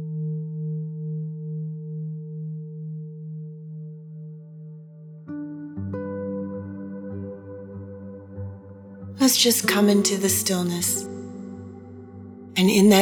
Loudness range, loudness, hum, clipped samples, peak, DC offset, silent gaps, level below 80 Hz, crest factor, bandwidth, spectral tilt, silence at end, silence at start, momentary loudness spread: 15 LU; -24 LUFS; none; under 0.1%; -2 dBFS; under 0.1%; none; -70 dBFS; 22 dB; over 20 kHz; -4 dB/octave; 0 s; 0 s; 23 LU